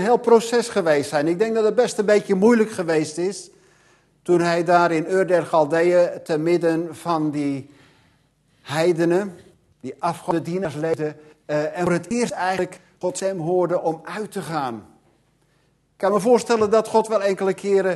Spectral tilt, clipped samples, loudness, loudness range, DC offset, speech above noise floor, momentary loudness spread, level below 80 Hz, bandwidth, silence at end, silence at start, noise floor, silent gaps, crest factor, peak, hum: -5.5 dB/octave; under 0.1%; -21 LUFS; 6 LU; under 0.1%; 43 dB; 11 LU; -64 dBFS; 12.5 kHz; 0 s; 0 s; -63 dBFS; none; 18 dB; -2 dBFS; none